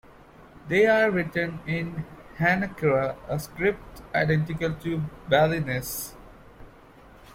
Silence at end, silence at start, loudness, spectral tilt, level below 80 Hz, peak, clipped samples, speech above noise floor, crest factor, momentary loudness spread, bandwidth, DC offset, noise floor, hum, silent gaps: 0 s; 0.4 s; -25 LUFS; -6 dB/octave; -50 dBFS; -8 dBFS; under 0.1%; 25 dB; 20 dB; 12 LU; 16.5 kHz; under 0.1%; -50 dBFS; none; none